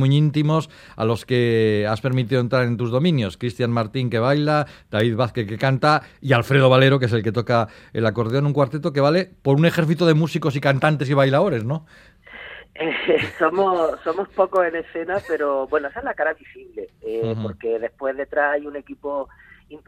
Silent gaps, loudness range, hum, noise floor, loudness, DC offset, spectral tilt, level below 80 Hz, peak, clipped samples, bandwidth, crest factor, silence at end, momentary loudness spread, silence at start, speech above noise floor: none; 6 LU; none; -40 dBFS; -20 LUFS; under 0.1%; -7.5 dB/octave; -56 dBFS; 0 dBFS; under 0.1%; 14.5 kHz; 20 dB; 0.1 s; 11 LU; 0 s; 20 dB